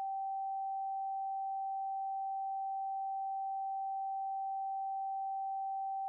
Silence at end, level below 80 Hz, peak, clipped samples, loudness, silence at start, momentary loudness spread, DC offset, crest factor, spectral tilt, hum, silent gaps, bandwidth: 0 s; under -90 dBFS; -36 dBFS; under 0.1%; -39 LUFS; 0 s; 0 LU; under 0.1%; 4 dB; 24.5 dB/octave; none; none; 0.9 kHz